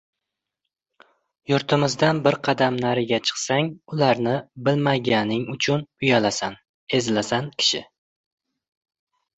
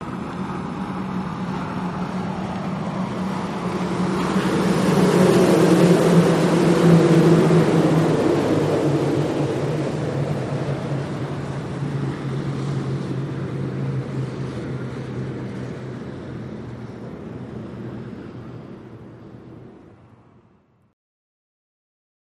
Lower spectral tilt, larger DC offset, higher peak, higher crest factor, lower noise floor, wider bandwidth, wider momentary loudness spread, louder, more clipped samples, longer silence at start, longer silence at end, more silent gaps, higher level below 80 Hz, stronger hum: second, -4.5 dB/octave vs -7 dB/octave; neither; about the same, -4 dBFS vs -2 dBFS; about the same, 20 dB vs 18 dB; first, -84 dBFS vs -58 dBFS; second, 8.2 kHz vs 13.5 kHz; second, 6 LU vs 19 LU; about the same, -22 LUFS vs -21 LUFS; neither; first, 1.5 s vs 0 s; second, 1.55 s vs 2.5 s; first, 6.69-6.87 s vs none; second, -60 dBFS vs -50 dBFS; neither